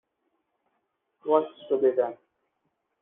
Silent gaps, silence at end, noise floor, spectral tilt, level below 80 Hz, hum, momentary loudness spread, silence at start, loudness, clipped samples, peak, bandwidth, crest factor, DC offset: none; 0.9 s; -77 dBFS; -4.5 dB/octave; -78 dBFS; none; 8 LU; 1.25 s; -26 LUFS; under 0.1%; -8 dBFS; 3.8 kHz; 20 dB; under 0.1%